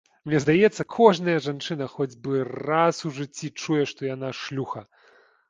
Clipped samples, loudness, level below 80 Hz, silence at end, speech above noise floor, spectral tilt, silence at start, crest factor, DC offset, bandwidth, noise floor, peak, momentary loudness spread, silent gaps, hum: under 0.1%; -24 LUFS; -64 dBFS; 0.65 s; 34 dB; -5.5 dB/octave; 0.25 s; 22 dB; under 0.1%; 9.4 kHz; -58 dBFS; -2 dBFS; 14 LU; none; none